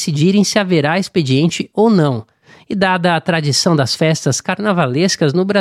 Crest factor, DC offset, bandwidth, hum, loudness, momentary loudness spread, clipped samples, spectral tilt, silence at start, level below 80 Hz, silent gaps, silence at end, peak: 14 dB; under 0.1%; 14.5 kHz; none; -14 LUFS; 4 LU; under 0.1%; -5 dB/octave; 0 s; -56 dBFS; none; 0 s; -2 dBFS